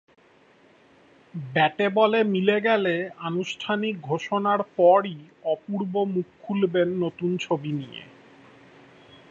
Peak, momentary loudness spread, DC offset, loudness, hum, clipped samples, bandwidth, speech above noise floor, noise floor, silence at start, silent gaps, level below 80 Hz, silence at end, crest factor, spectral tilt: -6 dBFS; 12 LU; under 0.1%; -24 LUFS; none; under 0.1%; 7.6 kHz; 33 dB; -57 dBFS; 1.35 s; none; -72 dBFS; 1.25 s; 18 dB; -6.5 dB/octave